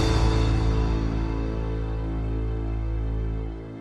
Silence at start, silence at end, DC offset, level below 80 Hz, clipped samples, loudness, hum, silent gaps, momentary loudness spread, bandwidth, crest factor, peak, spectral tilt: 0 s; 0 s; under 0.1%; -26 dBFS; under 0.1%; -27 LUFS; none; none; 7 LU; 8.6 kHz; 14 dB; -10 dBFS; -7 dB/octave